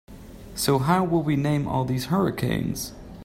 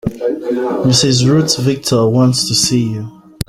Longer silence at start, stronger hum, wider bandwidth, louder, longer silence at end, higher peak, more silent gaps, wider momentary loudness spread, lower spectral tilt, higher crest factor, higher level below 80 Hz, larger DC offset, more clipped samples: about the same, 0.1 s vs 0.05 s; neither; about the same, 16.5 kHz vs 16 kHz; second, -24 LUFS vs -13 LUFS; about the same, 0 s vs 0.05 s; second, -6 dBFS vs 0 dBFS; neither; first, 12 LU vs 9 LU; first, -6 dB/octave vs -4.5 dB/octave; about the same, 18 dB vs 14 dB; about the same, -46 dBFS vs -42 dBFS; neither; neither